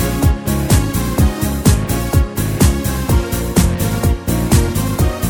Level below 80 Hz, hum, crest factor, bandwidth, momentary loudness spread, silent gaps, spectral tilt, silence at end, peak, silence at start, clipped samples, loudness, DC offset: -20 dBFS; none; 14 dB; 17.5 kHz; 3 LU; none; -5.5 dB/octave; 0 s; 0 dBFS; 0 s; under 0.1%; -16 LUFS; under 0.1%